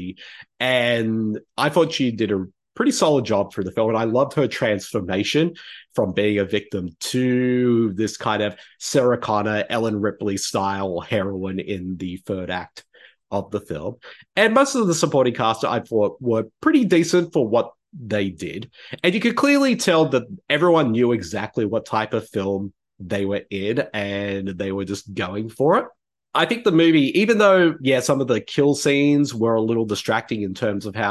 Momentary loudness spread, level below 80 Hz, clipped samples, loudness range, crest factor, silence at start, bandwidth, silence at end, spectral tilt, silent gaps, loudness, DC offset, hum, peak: 12 LU; -54 dBFS; under 0.1%; 7 LU; 18 dB; 0 s; 12.5 kHz; 0 s; -5 dB/octave; none; -21 LUFS; under 0.1%; none; -2 dBFS